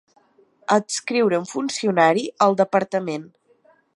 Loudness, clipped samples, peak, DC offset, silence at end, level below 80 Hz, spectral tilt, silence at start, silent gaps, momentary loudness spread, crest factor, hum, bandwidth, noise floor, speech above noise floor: -20 LUFS; under 0.1%; -2 dBFS; under 0.1%; 0.65 s; -74 dBFS; -4.5 dB/octave; 0.7 s; none; 9 LU; 20 dB; none; 11.5 kHz; -58 dBFS; 38 dB